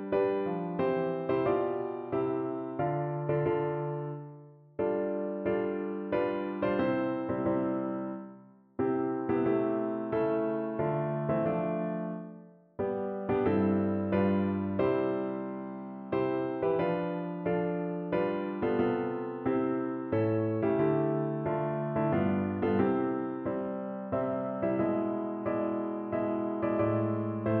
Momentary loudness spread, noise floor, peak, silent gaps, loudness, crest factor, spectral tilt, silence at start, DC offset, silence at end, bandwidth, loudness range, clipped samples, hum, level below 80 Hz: 7 LU; -54 dBFS; -16 dBFS; none; -31 LUFS; 14 dB; -8 dB/octave; 0 s; under 0.1%; 0 s; 4.5 kHz; 3 LU; under 0.1%; none; -64 dBFS